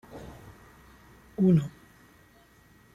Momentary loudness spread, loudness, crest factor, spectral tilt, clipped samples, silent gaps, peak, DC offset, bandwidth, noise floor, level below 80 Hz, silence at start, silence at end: 26 LU; -26 LUFS; 20 dB; -9.5 dB/octave; under 0.1%; none; -12 dBFS; under 0.1%; 12 kHz; -58 dBFS; -58 dBFS; 0.15 s; 1.25 s